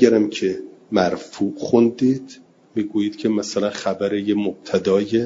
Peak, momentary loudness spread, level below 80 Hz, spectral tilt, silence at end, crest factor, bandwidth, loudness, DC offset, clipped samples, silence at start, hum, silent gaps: 0 dBFS; 8 LU; -62 dBFS; -6 dB/octave; 0 s; 20 dB; 7.8 kHz; -21 LUFS; under 0.1%; under 0.1%; 0 s; none; none